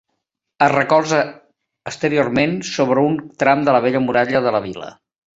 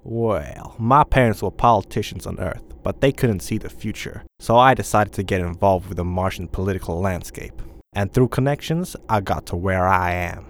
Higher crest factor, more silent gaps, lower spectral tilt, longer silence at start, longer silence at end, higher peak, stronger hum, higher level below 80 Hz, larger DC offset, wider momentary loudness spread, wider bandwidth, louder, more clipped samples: about the same, 18 dB vs 20 dB; neither; about the same, -5.5 dB/octave vs -6 dB/octave; first, 0.6 s vs 0.05 s; first, 0.5 s vs 0 s; about the same, 0 dBFS vs 0 dBFS; neither; second, -56 dBFS vs -36 dBFS; neither; about the same, 14 LU vs 14 LU; second, 8 kHz vs 18.5 kHz; first, -17 LUFS vs -21 LUFS; neither